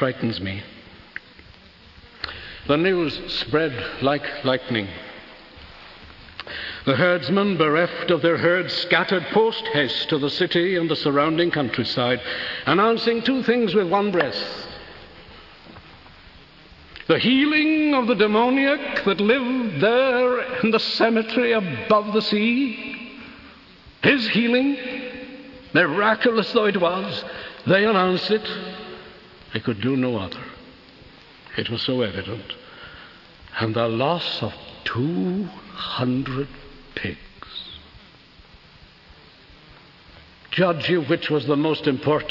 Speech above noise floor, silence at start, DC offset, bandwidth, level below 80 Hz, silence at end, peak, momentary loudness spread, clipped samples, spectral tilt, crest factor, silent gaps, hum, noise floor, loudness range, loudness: 28 dB; 0 s; under 0.1%; 6 kHz; -54 dBFS; 0 s; -4 dBFS; 19 LU; under 0.1%; -7 dB/octave; 18 dB; none; none; -49 dBFS; 9 LU; -21 LUFS